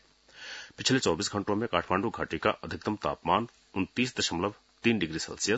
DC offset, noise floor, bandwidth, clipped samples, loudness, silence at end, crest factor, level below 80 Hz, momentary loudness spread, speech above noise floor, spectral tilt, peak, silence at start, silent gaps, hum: under 0.1%; -50 dBFS; 8.2 kHz; under 0.1%; -30 LUFS; 0 s; 24 dB; -60 dBFS; 8 LU; 20 dB; -4 dB/octave; -8 dBFS; 0.35 s; none; none